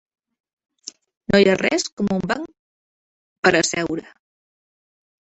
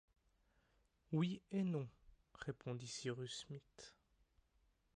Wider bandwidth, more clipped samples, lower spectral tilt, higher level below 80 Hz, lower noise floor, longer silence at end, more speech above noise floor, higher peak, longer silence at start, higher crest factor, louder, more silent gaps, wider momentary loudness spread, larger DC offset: second, 8.2 kHz vs 11 kHz; neither; second, -4 dB/octave vs -6 dB/octave; first, -52 dBFS vs -76 dBFS; first, under -90 dBFS vs -79 dBFS; first, 1.2 s vs 1.05 s; first, over 71 dB vs 35 dB; first, -2 dBFS vs -30 dBFS; first, 1.3 s vs 1.1 s; about the same, 22 dB vs 18 dB; first, -20 LUFS vs -46 LUFS; first, 1.92-1.97 s, 2.59-3.43 s vs none; first, 23 LU vs 15 LU; neither